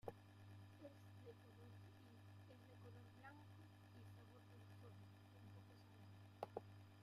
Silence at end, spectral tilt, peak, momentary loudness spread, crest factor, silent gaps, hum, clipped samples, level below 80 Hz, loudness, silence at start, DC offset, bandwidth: 0 s; -6.5 dB/octave; -34 dBFS; 7 LU; 28 dB; none; none; under 0.1%; -86 dBFS; -63 LUFS; 0.05 s; under 0.1%; 15 kHz